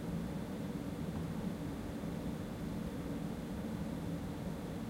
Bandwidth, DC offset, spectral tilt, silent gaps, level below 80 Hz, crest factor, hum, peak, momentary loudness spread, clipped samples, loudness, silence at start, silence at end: 16 kHz; under 0.1%; -7 dB/octave; none; -52 dBFS; 12 dB; none; -28 dBFS; 2 LU; under 0.1%; -42 LUFS; 0 s; 0 s